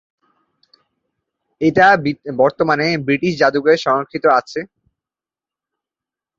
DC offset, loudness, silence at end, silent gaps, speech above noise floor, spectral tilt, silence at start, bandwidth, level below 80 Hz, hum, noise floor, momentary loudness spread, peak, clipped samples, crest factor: under 0.1%; -15 LUFS; 1.75 s; none; 74 dB; -6 dB/octave; 1.6 s; 7.6 kHz; -56 dBFS; none; -90 dBFS; 9 LU; -2 dBFS; under 0.1%; 16 dB